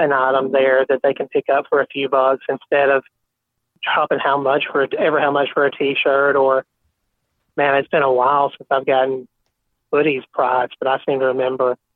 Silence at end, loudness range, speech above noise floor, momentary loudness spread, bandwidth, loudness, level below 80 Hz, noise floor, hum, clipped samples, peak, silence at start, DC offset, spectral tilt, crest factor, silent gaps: 0.2 s; 2 LU; 59 dB; 5 LU; 4.2 kHz; -18 LUFS; -64 dBFS; -76 dBFS; none; under 0.1%; -2 dBFS; 0 s; under 0.1%; -8 dB/octave; 16 dB; none